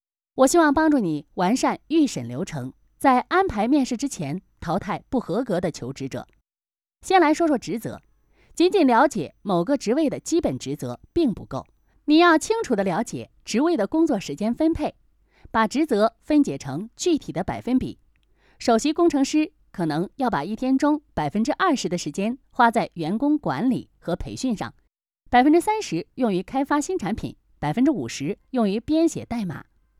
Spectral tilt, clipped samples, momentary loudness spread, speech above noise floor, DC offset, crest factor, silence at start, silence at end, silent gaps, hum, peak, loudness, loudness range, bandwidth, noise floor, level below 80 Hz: -5 dB/octave; under 0.1%; 13 LU; over 68 dB; under 0.1%; 18 dB; 0.35 s; 0.4 s; none; none; -4 dBFS; -23 LUFS; 3 LU; 14.5 kHz; under -90 dBFS; -50 dBFS